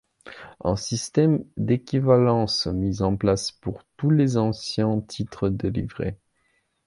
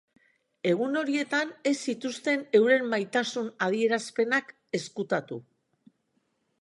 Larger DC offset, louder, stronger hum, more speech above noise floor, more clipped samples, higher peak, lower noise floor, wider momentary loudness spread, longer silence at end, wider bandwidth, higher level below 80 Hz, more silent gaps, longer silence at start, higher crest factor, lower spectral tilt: neither; first, -24 LUFS vs -27 LUFS; neither; about the same, 46 dB vs 47 dB; neither; first, -4 dBFS vs -10 dBFS; second, -69 dBFS vs -74 dBFS; first, 12 LU vs 9 LU; second, 0.7 s vs 1.2 s; about the same, 11.5 kHz vs 11.5 kHz; first, -46 dBFS vs -82 dBFS; neither; second, 0.25 s vs 0.65 s; about the same, 20 dB vs 18 dB; first, -6.5 dB/octave vs -4.5 dB/octave